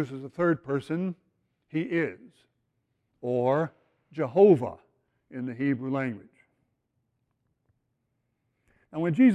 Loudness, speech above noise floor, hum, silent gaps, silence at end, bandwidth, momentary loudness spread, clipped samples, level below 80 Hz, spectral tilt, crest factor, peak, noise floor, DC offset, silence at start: -27 LUFS; 52 dB; none; none; 0 s; 9.2 kHz; 18 LU; under 0.1%; -70 dBFS; -9 dB/octave; 20 dB; -8 dBFS; -78 dBFS; under 0.1%; 0 s